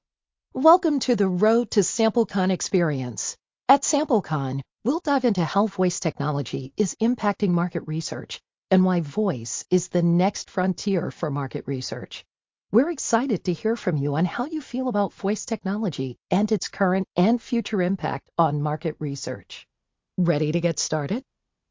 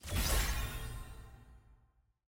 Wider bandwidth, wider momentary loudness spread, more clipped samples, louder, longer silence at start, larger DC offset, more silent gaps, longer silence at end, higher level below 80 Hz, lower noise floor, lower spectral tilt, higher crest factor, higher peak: second, 7.8 kHz vs 17 kHz; second, 10 LU vs 21 LU; neither; first, -24 LUFS vs -37 LUFS; first, 0.55 s vs 0.05 s; neither; first, 8.58-8.62 s vs none; about the same, 0.5 s vs 0.55 s; second, -62 dBFS vs -40 dBFS; first, -88 dBFS vs -71 dBFS; first, -5.5 dB/octave vs -3 dB/octave; about the same, 20 dB vs 18 dB; first, -4 dBFS vs -20 dBFS